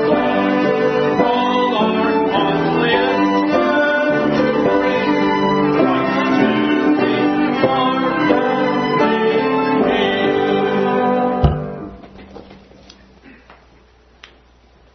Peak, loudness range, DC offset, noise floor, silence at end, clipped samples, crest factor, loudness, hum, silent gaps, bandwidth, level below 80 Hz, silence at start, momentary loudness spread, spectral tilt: 0 dBFS; 5 LU; under 0.1%; -49 dBFS; 1.4 s; under 0.1%; 16 dB; -16 LUFS; none; none; 6.4 kHz; -38 dBFS; 0 s; 2 LU; -7 dB/octave